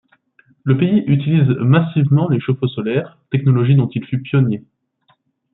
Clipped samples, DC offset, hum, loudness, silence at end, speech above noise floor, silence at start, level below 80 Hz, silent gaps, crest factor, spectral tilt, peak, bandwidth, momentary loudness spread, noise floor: under 0.1%; under 0.1%; none; -16 LUFS; 0.95 s; 46 dB; 0.65 s; -56 dBFS; none; 14 dB; -13.5 dB/octave; -2 dBFS; 4 kHz; 8 LU; -61 dBFS